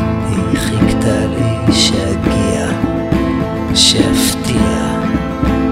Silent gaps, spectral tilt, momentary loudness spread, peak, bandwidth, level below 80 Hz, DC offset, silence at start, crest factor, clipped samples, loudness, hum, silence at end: none; -4.5 dB/octave; 7 LU; 0 dBFS; 16.5 kHz; -26 dBFS; under 0.1%; 0 s; 14 dB; under 0.1%; -14 LUFS; none; 0 s